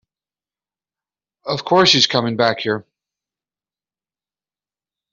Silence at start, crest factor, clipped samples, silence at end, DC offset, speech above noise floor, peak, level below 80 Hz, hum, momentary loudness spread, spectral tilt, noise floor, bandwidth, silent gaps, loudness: 1.45 s; 20 dB; under 0.1%; 2.3 s; under 0.1%; over 74 dB; -2 dBFS; -64 dBFS; 50 Hz at -60 dBFS; 14 LU; -2 dB/octave; under -90 dBFS; 7.8 kHz; none; -16 LUFS